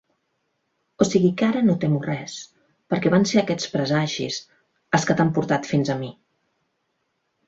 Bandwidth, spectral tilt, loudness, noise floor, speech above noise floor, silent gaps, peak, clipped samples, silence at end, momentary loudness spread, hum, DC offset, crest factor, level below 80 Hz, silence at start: 8 kHz; -5.5 dB/octave; -22 LUFS; -73 dBFS; 52 dB; none; -4 dBFS; under 0.1%; 1.35 s; 11 LU; none; under 0.1%; 20 dB; -60 dBFS; 1 s